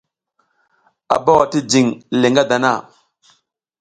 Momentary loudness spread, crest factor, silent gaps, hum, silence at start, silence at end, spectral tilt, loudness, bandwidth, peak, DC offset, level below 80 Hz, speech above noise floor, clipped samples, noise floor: 5 LU; 18 dB; none; none; 1.1 s; 1 s; -4.5 dB/octave; -15 LUFS; 10.5 kHz; 0 dBFS; under 0.1%; -56 dBFS; 52 dB; under 0.1%; -67 dBFS